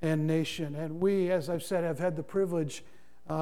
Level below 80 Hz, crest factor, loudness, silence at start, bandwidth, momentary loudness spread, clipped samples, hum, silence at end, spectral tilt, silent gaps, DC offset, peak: -66 dBFS; 14 dB; -31 LUFS; 0 s; 16.5 kHz; 8 LU; under 0.1%; none; 0 s; -6.5 dB/octave; none; 0.5%; -16 dBFS